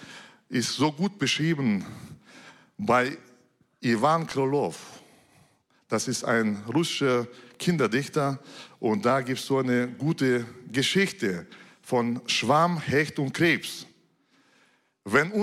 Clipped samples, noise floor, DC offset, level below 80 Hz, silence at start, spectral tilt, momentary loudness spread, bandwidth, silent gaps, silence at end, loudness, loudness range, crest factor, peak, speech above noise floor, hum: under 0.1%; -65 dBFS; under 0.1%; -68 dBFS; 0 s; -5 dB/octave; 15 LU; 15.5 kHz; none; 0 s; -26 LUFS; 2 LU; 18 dB; -8 dBFS; 39 dB; none